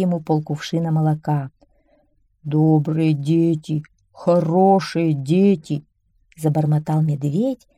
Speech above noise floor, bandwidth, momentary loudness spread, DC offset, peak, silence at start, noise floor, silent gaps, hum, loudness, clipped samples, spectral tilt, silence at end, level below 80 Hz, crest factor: 43 dB; 11.5 kHz; 9 LU; under 0.1%; -4 dBFS; 0 s; -61 dBFS; none; none; -19 LUFS; under 0.1%; -8.5 dB/octave; 0.2 s; -60 dBFS; 16 dB